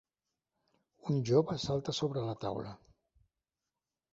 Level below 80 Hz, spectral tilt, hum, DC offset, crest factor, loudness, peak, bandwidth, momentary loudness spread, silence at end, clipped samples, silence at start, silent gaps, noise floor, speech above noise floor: -66 dBFS; -6.5 dB/octave; none; under 0.1%; 22 dB; -34 LUFS; -14 dBFS; 7.6 kHz; 13 LU; 1.4 s; under 0.1%; 1.05 s; none; under -90 dBFS; over 57 dB